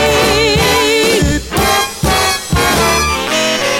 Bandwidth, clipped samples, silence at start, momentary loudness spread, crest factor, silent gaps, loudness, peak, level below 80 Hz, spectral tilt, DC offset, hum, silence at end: 18.5 kHz; under 0.1%; 0 s; 3 LU; 10 dB; none; -12 LUFS; -2 dBFS; -26 dBFS; -3 dB/octave; under 0.1%; none; 0 s